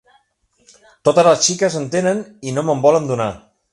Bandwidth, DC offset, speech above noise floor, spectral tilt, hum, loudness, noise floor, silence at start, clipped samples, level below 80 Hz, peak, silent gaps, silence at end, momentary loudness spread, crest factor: 11.5 kHz; under 0.1%; 46 dB; -4 dB/octave; none; -16 LUFS; -62 dBFS; 1.05 s; under 0.1%; -56 dBFS; 0 dBFS; none; 0.35 s; 12 LU; 18 dB